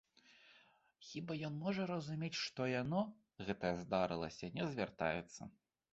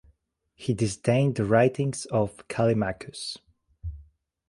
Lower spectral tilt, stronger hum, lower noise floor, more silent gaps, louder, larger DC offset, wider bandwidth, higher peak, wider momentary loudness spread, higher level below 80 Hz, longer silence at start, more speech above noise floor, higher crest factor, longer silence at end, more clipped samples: second, -4.5 dB/octave vs -6 dB/octave; neither; about the same, -70 dBFS vs -67 dBFS; neither; second, -42 LUFS vs -26 LUFS; neither; second, 8 kHz vs 11.5 kHz; second, -22 dBFS vs -8 dBFS; second, 11 LU vs 19 LU; second, -70 dBFS vs -50 dBFS; second, 0.3 s vs 0.6 s; second, 29 dB vs 42 dB; about the same, 22 dB vs 20 dB; about the same, 0.4 s vs 0.45 s; neither